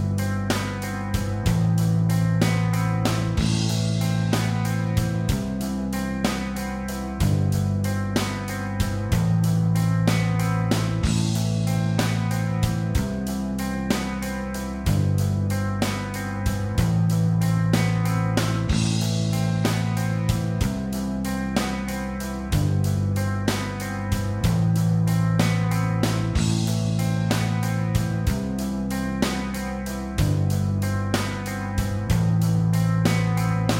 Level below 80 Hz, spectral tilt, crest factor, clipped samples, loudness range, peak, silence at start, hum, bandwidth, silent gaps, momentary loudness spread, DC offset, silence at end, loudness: -36 dBFS; -6 dB/octave; 16 dB; under 0.1%; 3 LU; -6 dBFS; 0 s; none; 16.5 kHz; none; 6 LU; under 0.1%; 0 s; -24 LUFS